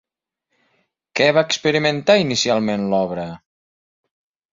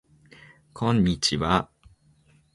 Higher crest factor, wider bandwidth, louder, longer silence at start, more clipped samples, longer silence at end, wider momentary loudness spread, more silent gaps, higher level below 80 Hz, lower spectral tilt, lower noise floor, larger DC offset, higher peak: about the same, 18 dB vs 22 dB; second, 7.8 kHz vs 11.5 kHz; first, -18 LUFS vs -24 LUFS; first, 1.15 s vs 0.75 s; neither; first, 1.15 s vs 0.9 s; first, 11 LU vs 7 LU; neither; second, -58 dBFS vs -46 dBFS; about the same, -4 dB/octave vs -5 dB/octave; first, -77 dBFS vs -60 dBFS; neither; first, -2 dBFS vs -6 dBFS